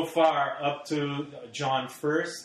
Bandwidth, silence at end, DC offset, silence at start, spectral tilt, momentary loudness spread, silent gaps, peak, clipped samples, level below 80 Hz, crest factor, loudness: 14.5 kHz; 0 s; under 0.1%; 0 s; -5 dB/octave; 9 LU; none; -10 dBFS; under 0.1%; -72 dBFS; 18 dB; -28 LUFS